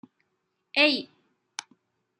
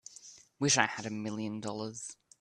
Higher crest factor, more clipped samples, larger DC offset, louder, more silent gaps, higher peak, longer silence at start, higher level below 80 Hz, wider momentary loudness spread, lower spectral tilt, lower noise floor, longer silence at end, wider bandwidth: about the same, 24 dB vs 28 dB; neither; neither; first, -23 LUFS vs -32 LUFS; neither; about the same, -6 dBFS vs -8 dBFS; first, 0.75 s vs 0.1 s; second, -86 dBFS vs -70 dBFS; second, 19 LU vs 22 LU; about the same, -1.5 dB/octave vs -2.5 dB/octave; first, -78 dBFS vs -55 dBFS; first, 1.15 s vs 0.25 s; second, 11 kHz vs 12.5 kHz